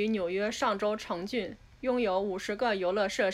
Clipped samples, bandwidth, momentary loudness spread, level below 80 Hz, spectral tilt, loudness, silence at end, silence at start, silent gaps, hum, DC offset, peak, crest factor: under 0.1%; 15 kHz; 6 LU; -60 dBFS; -4.5 dB/octave; -31 LUFS; 0 s; 0 s; none; none; under 0.1%; -16 dBFS; 14 dB